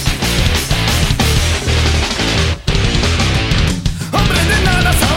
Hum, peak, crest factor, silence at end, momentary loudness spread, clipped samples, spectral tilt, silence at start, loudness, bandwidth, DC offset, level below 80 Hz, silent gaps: none; 0 dBFS; 12 dB; 0 s; 4 LU; under 0.1%; -4 dB/octave; 0 s; -14 LUFS; 16.5 kHz; under 0.1%; -18 dBFS; none